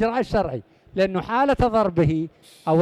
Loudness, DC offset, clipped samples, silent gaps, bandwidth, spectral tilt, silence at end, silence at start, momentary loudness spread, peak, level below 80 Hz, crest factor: -22 LUFS; under 0.1%; under 0.1%; none; 12.5 kHz; -8 dB/octave; 0 s; 0 s; 13 LU; -8 dBFS; -40 dBFS; 14 dB